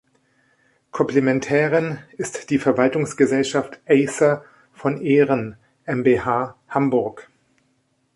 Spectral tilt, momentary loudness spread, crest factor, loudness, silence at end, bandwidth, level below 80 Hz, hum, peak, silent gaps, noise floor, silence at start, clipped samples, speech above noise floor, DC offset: -6 dB/octave; 11 LU; 18 dB; -20 LUFS; 0.9 s; 11.5 kHz; -58 dBFS; none; -2 dBFS; none; -66 dBFS; 0.95 s; under 0.1%; 47 dB; under 0.1%